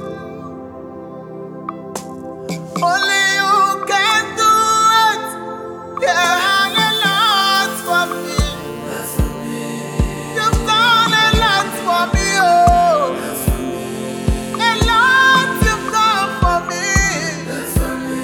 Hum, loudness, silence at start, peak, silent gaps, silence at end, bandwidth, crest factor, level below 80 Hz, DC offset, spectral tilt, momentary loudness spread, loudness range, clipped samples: none; -15 LUFS; 0 s; 0 dBFS; none; 0 s; over 20 kHz; 16 dB; -28 dBFS; under 0.1%; -3 dB/octave; 18 LU; 4 LU; under 0.1%